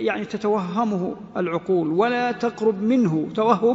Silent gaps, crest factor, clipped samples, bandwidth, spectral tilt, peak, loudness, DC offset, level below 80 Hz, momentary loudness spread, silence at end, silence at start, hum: none; 18 dB; under 0.1%; 8 kHz; -7.5 dB/octave; -4 dBFS; -22 LUFS; under 0.1%; -62 dBFS; 6 LU; 0 s; 0 s; none